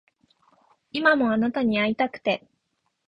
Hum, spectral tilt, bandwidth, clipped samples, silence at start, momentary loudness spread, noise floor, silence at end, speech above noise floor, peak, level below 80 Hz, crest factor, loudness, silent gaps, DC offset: none; -7 dB/octave; 5.6 kHz; under 0.1%; 0.95 s; 8 LU; -75 dBFS; 0.7 s; 53 dB; -6 dBFS; -62 dBFS; 20 dB; -23 LUFS; none; under 0.1%